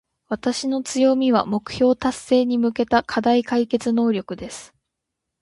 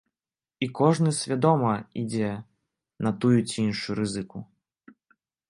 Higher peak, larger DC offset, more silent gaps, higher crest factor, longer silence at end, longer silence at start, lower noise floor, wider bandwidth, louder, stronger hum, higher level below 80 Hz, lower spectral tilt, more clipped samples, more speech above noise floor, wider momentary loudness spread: about the same, -4 dBFS vs -6 dBFS; neither; neither; about the same, 18 dB vs 20 dB; second, 0.75 s vs 1.05 s; second, 0.3 s vs 0.6 s; second, -81 dBFS vs under -90 dBFS; about the same, 11.5 kHz vs 11 kHz; first, -20 LUFS vs -26 LUFS; neither; first, -54 dBFS vs -62 dBFS; second, -4.5 dB/octave vs -6 dB/octave; neither; second, 61 dB vs over 65 dB; about the same, 10 LU vs 11 LU